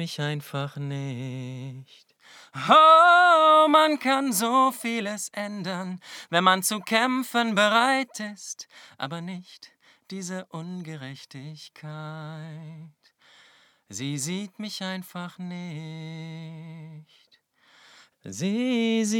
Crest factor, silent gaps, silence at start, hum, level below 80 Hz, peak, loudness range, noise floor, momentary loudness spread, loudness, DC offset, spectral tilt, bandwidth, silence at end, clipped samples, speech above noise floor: 22 dB; none; 0 s; none; -82 dBFS; -4 dBFS; 20 LU; -63 dBFS; 24 LU; -22 LUFS; under 0.1%; -4 dB/octave; over 20 kHz; 0 s; under 0.1%; 38 dB